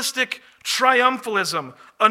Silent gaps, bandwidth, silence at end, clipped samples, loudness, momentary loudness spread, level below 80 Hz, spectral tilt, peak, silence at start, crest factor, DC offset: none; 16.5 kHz; 0 s; under 0.1%; -20 LUFS; 13 LU; -78 dBFS; -1.5 dB/octave; 0 dBFS; 0 s; 20 dB; under 0.1%